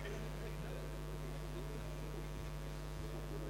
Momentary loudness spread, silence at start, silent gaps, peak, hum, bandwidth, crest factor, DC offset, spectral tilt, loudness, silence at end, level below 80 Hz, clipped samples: 1 LU; 0 s; none; -34 dBFS; none; 16 kHz; 12 dB; under 0.1%; -6 dB/octave; -47 LUFS; 0 s; -48 dBFS; under 0.1%